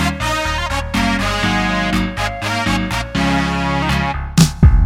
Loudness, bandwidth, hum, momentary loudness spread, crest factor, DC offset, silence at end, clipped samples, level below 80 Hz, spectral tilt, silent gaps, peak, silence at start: -17 LUFS; 16.5 kHz; none; 5 LU; 16 dB; under 0.1%; 0 s; under 0.1%; -22 dBFS; -5 dB/octave; none; 0 dBFS; 0 s